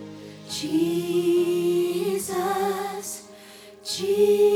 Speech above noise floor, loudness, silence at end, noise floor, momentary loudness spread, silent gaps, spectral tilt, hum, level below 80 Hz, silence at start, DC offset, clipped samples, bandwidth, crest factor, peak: 25 dB; -24 LUFS; 0 s; -46 dBFS; 19 LU; none; -4.5 dB/octave; none; -66 dBFS; 0 s; under 0.1%; under 0.1%; 18 kHz; 14 dB; -10 dBFS